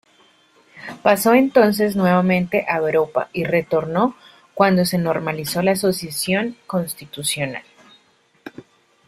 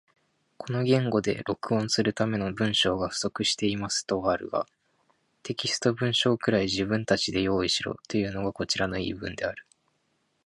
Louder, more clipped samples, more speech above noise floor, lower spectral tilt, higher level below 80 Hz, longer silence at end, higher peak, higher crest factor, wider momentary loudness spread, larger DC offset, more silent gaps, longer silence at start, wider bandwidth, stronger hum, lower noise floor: first, -19 LUFS vs -27 LUFS; neither; second, 40 dB vs 46 dB; about the same, -5 dB/octave vs -4.5 dB/octave; about the same, -58 dBFS vs -54 dBFS; second, 0.45 s vs 0.85 s; first, -2 dBFS vs -8 dBFS; about the same, 18 dB vs 20 dB; first, 14 LU vs 9 LU; neither; neither; first, 0.75 s vs 0.6 s; first, 16 kHz vs 11.5 kHz; neither; second, -58 dBFS vs -73 dBFS